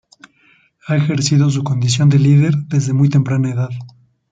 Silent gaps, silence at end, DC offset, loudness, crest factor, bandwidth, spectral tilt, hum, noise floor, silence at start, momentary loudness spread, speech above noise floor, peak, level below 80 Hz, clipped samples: none; 0.45 s; under 0.1%; -15 LUFS; 12 dB; 9 kHz; -6 dB/octave; none; -54 dBFS; 0.85 s; 8 LU; 40 dB; -2 dBFS; -54 dBFS; under 0.1%